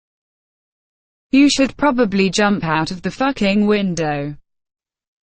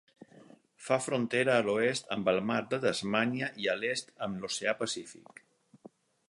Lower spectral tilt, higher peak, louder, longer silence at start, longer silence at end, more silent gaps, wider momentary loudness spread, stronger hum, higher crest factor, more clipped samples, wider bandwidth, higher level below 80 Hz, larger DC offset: about the same, -5 dB/octave vs -4 dB/octave; first, -2 dBFS vs -12 dBFS; first, -17 LUFS vs -31 LUFS; first, 1.35 s vs 0.8 s; second, 0.9 s vs 1.15 s; neither; about the same, 8 LU vs 10 LU; neither; second, 16 dB vs 22 dB; neither; second, 9.2 kHz vs 11.5 kHz; first, -46 dBFS vs -72 dBFS; neither